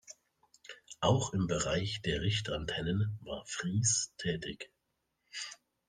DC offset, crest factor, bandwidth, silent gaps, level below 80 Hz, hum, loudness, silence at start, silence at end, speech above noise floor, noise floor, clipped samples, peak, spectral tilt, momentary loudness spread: under 0.1%; 22 dB; 10 kHz; none; -56 dBFS; none; -34 LUFS; 0.1 s; 0.35 s; 49 dB; -82 dBFS; under 0.1%; -14 dBFS; -4 dB/octave; 18 LU